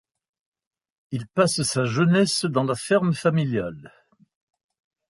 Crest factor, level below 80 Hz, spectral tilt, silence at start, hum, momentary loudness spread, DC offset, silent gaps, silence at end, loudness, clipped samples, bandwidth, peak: 20 dB; -60 dBFS; -5 dB/octave; 1.1 s; none; 10 LU; under 0.1%; none; 1.2 s; -22 LUFS; under 0.1%; 11.5 kHz; -6 dBFS